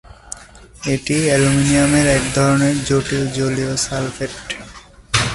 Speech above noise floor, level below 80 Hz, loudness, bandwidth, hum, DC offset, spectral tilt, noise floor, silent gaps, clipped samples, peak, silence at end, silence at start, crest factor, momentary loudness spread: 25 dB; -36 dBFS; -17 LUFS; 11.5 kHz; none; under 0.1%; -4.5 dB/octave; -41 dBFS; none; under 0.1%; 0 dBFS; 0 s; 0.05 s; 18 dB; 15 LU